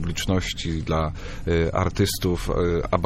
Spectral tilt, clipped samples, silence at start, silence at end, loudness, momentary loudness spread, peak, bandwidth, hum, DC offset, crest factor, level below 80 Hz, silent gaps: -5.5 dB/octave; under 0.1%; 0 s; 0 s; -24 LUFS; 5 LU; -4 dBFS; 15.5 kHz; none; under 0.1%; 20 dB; -34 dBFS; none